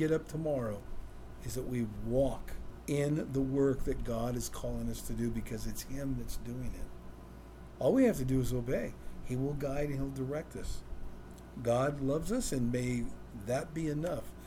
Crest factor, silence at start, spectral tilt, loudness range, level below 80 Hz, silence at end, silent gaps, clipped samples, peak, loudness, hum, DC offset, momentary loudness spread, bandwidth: 16 dB; 0 s; -6.5 dB/octave; 5 LU; -44 dBFS; 0 s; none; under 0.1%; -18 dBFS; -35 LUFS; none; under 0.1%; 18 LU; 16.5 kHz